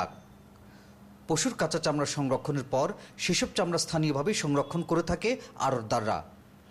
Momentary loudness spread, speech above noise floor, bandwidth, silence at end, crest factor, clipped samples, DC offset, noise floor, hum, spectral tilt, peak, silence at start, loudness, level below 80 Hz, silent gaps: 5 LU; 24 dB; 15 kHz; 0.3 s; 14 dB; under 0.1%; under 0.1%; -53 dBFS; none; -4.5 dB/octave; -18 dBFS; 0 s; -29 LUFS; -54 dBFS; none